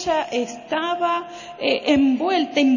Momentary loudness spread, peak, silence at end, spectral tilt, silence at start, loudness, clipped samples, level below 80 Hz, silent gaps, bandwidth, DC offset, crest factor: 8 LU; -4 dBFS; 0 s; -4 dB/octave; 0 s; -21 LUFS; under 0.1%; -56 dBFS; none; 7.4 kHz; under 0.1%; 16 dB